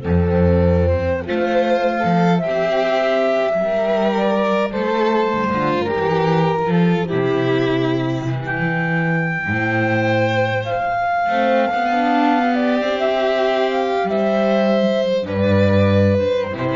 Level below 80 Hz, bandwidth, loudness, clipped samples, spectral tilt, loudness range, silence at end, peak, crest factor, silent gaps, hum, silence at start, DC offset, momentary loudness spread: -40 dBFS; 7.4 kHz; -18 LUFS; under 0.1%; -7.5 dB/octave; 2 LU; 0 s; -4 dBFS; 12 dB; none; none; 0 s; under 0.1%; 4 LU